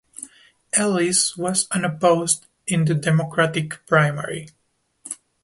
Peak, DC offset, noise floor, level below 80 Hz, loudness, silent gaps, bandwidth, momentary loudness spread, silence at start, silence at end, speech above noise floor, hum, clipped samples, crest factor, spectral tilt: -2 dBFS; under 0.1%; -47 dBFS; -60 dBFS; -20 LUFS; none; 11.5 kHz; 16 LU; 0.2 s; 0.3 s; 26 dB; none; under 0.1%; 20 dB; -4 dB/octave